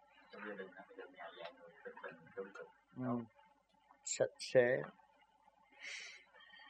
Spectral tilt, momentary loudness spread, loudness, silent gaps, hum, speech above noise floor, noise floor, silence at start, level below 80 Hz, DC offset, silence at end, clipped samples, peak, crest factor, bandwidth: -4 dB/octave; 22 LU; -41 LUFS; none; none; 30 dB; -72 dBFS; 0.3 s; -86 dBFS; under 0.1%; 0 s; under 0.1%; -18 dBFS; 26 dB; 9.4 kHz